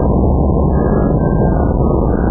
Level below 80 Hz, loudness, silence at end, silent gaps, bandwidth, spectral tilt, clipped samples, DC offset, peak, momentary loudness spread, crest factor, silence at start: -16 dBFS; -14 LUFS; 0 s; none; 1.8 kHz; -15.5 dB/octave; under 0.1%; under 0.1%; -2 dBFS; 1 LU; 10 dB; 0 s